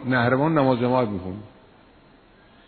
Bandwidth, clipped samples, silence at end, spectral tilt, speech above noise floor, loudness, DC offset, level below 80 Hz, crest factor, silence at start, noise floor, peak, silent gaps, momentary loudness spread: 4.5 kHz; under 0.1%; 1.2 s; -11 dB/octave; 32 dB; -21 LUFS; under 0.1%; -56 dBFS; 18 dB; 0 s; -53 dBFS; -4 dBFS; none; 15 LU